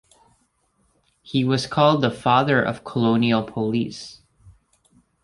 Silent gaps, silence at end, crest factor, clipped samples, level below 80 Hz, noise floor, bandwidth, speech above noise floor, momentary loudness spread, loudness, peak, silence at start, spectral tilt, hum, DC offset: none; 0.75 s; 20 dB; under 0.1%; -56 dBFS; -66 dBFS; 11.5 kHz; 46 dB; 9 LU; -21 LUFS; -2 dBFS; 1.25 s; -6.5 dB/octave; none; under 0.1%